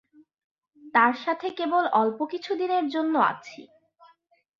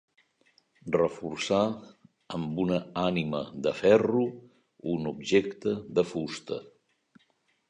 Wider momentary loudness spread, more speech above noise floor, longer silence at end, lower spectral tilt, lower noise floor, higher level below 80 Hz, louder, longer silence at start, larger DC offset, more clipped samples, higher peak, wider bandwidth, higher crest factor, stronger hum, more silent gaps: second, 9 LU vs 15 LU; about the same, 40 dB vs 43 dB; about the same, 0.95 s vs 1 s; about the same, -5.5 dB/octave vs -6 dB/octave; second, -64 dBFS vs -71 dBFS; second, -78 dBFS vs -62 dBFS; first, -25 LUFS vs -29 LUFS; about the same, 0.85 s vs 0.85 s; neither; neither; about the same, -6 dBFS vs -8 dBFS; second, 7.4 kHz vs 10.5 kHz; about the same, 20 dB vs 22 dB; neither; neither